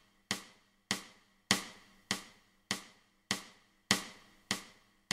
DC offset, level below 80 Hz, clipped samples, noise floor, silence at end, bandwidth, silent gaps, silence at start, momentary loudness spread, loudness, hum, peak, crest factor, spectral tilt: under 0.1%; -72 dBFS; under 0.1%; -61 dBFS; 0.4 s; 16 kHz; none; 0.3 s; 24 LU; -37 LUFS; none; -8 dBFS; 32 dB; -1.5 dB/octave